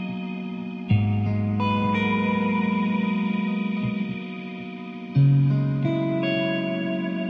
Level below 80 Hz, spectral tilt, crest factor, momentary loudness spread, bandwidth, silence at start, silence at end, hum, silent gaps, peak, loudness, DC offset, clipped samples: -56 dBFS; -9.5 dB/octave; 14 dB; 12 LU; 5.2 kHz; 0 s; 0 s; none; none; -10 dBFS; -24 LUFS; under 0.1%; under 0.1%